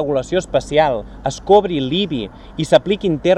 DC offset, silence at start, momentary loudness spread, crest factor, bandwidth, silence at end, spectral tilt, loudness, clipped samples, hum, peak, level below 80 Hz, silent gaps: under 0.1%; 0 s; 12 LU; 16 dB; 11 kHz; 0 s; -5.5 dB/octave; -17 LUFS; under 0.1%; none; 0 dBFS; -40 dBFS; none